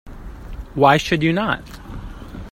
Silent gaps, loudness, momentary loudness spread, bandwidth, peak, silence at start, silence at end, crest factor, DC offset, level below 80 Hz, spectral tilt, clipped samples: none; -17 LUFS; 22 LU; 16 kHz; 0 dBFS; 0.05 s; 0 s; 20 dB; under 0.1%; -36 dBFS; -5.5 dB/octave; under 0.1%